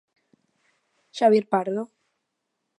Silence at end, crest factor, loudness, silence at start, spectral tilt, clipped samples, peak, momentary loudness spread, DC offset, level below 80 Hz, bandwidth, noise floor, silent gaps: 0.95 s; 20 dB; -23 LUFS; 1.15 s; -6 dB/octave; under 0.1%; -6 dBFS; 20 LU; under 0.1%; -82 dBFS; 10.5 kHz; -79 dBFS; none